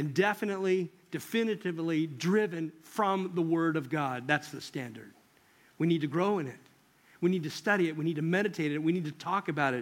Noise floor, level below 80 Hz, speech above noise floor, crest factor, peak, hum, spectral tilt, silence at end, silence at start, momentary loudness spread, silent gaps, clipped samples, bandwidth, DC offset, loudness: -63 dBFS; -80 dBFS; 33 dB; 20 dB; -12 dBFS; none; -6 dB/octave; 0 s; 0 s; 10 LU; none; under 0.1%; 16.5 kHz; under 0.1%; -31 LUFS